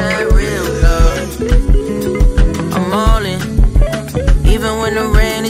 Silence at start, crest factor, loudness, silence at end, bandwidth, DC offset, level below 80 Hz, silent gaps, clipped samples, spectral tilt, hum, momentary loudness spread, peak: 0 s; 12 dB; -15 LUFS; 0 s; 15 kHz; under 0.1%; -12 dBFS; none; under 0.1%; -5.5 dB/octave; none; 4 LU; 0 dBFS